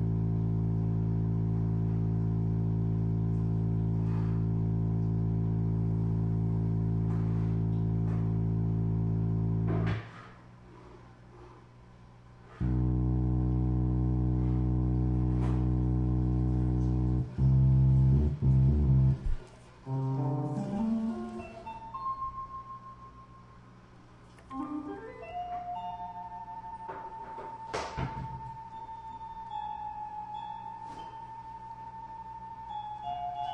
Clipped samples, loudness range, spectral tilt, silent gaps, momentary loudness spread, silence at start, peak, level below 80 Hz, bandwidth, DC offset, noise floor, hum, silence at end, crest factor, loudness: under 0.1%; 14 LU; -10 dB/octave; none; 16 LU; 0 s; -16 dBFS; -38 dBFS; 6.4 kHz; under 0.1%; -54 dBFS; none; 0 s; 14 dB; -31 LUFS